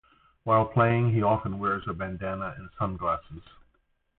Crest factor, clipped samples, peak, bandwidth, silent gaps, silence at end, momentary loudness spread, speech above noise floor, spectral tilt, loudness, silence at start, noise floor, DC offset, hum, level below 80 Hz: 18 dB; under 0.1%; -10 dBFS; 4.1 kHz; none; 0.8 s; 14 LU; 43 dB; -12 dB/octave; -27 LUFS; 0.45 s; -70 dBFS; under 0.1%; none; -50 dBFS